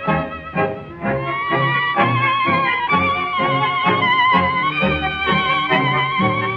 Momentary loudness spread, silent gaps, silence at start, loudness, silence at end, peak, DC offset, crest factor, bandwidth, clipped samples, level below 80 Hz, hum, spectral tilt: 7 LU; none; 0 s; -17 LUFS; 0 s; -2 dBFS; under 0.1%; 16 dB; 6.6 kHz; under 0.1%; -44 dBFS; none; -7.5 dB/octave